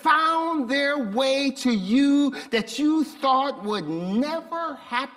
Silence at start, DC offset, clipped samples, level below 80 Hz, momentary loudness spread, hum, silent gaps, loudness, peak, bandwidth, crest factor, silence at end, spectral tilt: 0 s; under 0.1%; under 0.1%; -66 dBFS; 8 LU; none; none; -23 LUFS; -6 dBFS; 13.5 kHz; 18 dB; 0 s; -4.5 dB/octave